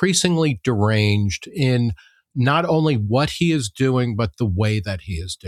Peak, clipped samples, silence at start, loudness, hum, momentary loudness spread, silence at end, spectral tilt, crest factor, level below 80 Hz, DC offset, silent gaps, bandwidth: -2 dBFS; under 0.1%; 0 s; -20 LUFS; none; 8 LU; 0 s; -5.5 dB/octave; 16 dB; -46 dBFS; under 0.1%; none; 14 kHz